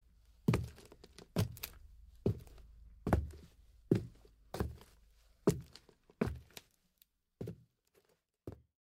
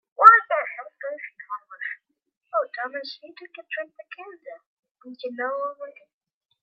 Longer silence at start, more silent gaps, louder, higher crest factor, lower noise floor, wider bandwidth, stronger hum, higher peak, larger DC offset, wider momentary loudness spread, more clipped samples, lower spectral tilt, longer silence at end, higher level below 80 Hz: first, 0.5 s vs 0.2 s; second, none vs 2.37-2.41 s, 4.66-4.83 s, 4.91-4.95 s; second, -40 LUFS vs -22 LUFS; about the same, 26 dB vs 26 dB; first, -75 dBFS vs -42 dBFS; first, 16 kHz vs 10 kHz; neither; second, -16 dBFS vs 0 dBFS; neither; second, 22 LU vs 25 LU; neither; first, -7 dB/octave vs -2 dB/octave; second, 0.3 s vs 0.7 s; first, -52 dBFS vs -86 dBFS